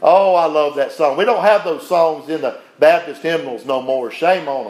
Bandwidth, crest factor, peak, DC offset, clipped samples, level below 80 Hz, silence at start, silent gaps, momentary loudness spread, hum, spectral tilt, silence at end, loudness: 14.5 kHz; 16 dB; 0 dBFS; under 0.1%; under 0.1%; -74 dBFS; 0 s; none; 9 LU; none; -5 dB/octave; 0 s; -16 LUFS